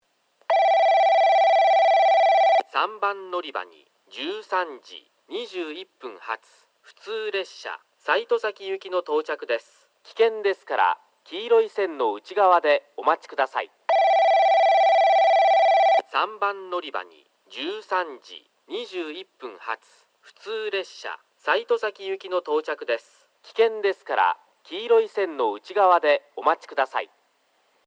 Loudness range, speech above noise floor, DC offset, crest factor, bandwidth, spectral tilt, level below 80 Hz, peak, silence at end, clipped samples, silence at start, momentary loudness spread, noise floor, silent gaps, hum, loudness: 13 LU; 41 dB; under 0.1%; 18 dB; 8 kHz; -2 dB/octave; under -90 dBFS; -6 dBFS; 0.8 s; under 0.1%; 0.5 s; 17 LU; -66 dBFS; none; none; -22 LUFS